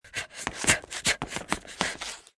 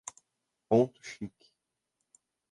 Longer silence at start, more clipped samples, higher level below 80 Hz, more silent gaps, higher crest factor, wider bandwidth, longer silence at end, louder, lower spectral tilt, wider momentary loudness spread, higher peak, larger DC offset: second, 0.05 s vs 0.7 s; neither; first, -52 dBFS vs -72 dBFS; neither; first, 28 dB vs 22 dB; about the same, 12 kHz vs 11.5 kHz; second, 0.2 s vs 1.25 s; about the same, -28 LUFS vs -30 LUFS; second, -1.5 dB/octave vs -6.5 dB/octave; second, 11 LU vs 18 LU; first, -2 dBFS vs -12 dBFS; neither